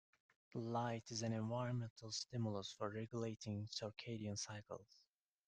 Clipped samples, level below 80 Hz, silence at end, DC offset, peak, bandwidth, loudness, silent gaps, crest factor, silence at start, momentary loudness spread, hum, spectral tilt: under 0.1%; -78 dBFS; 0.5 s; under 0.1%; -28 dBFS; 9.4 kHz; -46 LUFS; 1.90-1.96 s; 18 dB; 0.55 s; 6 LU; none; -5 dB/octave